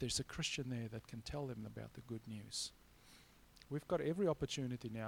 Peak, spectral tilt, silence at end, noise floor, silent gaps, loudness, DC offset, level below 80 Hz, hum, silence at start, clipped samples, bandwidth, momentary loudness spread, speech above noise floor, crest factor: -26 dBFS; -4.5 dB/octave; 0 s; -65 dBFS; none; -43 LUFS; under 0.1%; -62 dBFS; none; 0 s; under 0.1%; 19 kHz; 14 LU; 22 dB; 18 dB